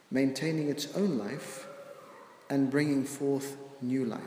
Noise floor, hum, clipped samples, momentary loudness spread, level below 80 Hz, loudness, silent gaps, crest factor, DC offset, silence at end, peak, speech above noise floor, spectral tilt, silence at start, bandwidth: -52 dBFS; none; under 0.1%; 19 LU; -80 dBFS; -32 LUFS; none; 16 dB; under 0.1%; 0 s; -16 dBFS; 21 dB; -5.5 dB/octave; 0.1 s; 16 kHz